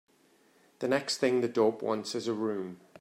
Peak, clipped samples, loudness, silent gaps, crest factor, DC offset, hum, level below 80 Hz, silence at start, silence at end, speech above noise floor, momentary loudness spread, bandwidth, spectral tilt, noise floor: -12 dBFS; under 0.1%; -30 LUFS; none; 20 dB; under 0.1%; none; -80 dBFS; 0.8 s; 0.25 s; 35 dB; 9 LU; 15 kHz; -4.5 dB/octave; -65 dBFS